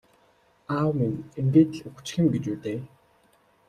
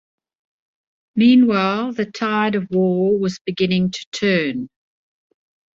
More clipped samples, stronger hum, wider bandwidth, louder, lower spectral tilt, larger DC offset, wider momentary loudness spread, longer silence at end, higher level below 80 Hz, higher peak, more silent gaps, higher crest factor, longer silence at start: neither; neither; first, 11 kHz vs 7.6 kHz; second, -26 LUFS vs -18 LUFS; about the same, -7.5 dB/octave vs -6.5 dB/octave; neither; about the same, 13 LU vs 11 LU; second, 0.85 s vs 1.05 s; about the same, -60 dBFS vs -60 dBFS; second, -8 dBFS vs -4 dBFS; second, none vs 3.41-3.45 s, 4.06-4.12 s; about the same, 20 dB vs 16 dB; second, 0.7 s vs 1.15 s